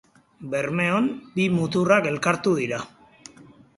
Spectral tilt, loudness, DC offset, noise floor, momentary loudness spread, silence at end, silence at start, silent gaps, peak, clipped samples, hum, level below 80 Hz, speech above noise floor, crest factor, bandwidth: -6 dB/octave; -23 LUFS; under 0.1%; -50 dBFS; 11 LU; 0.35 s; 0.4 s; none; -4 dBFS; under 0.1%; none; -62 dBFS; 28 dB; 20 dB; 11.5 kHz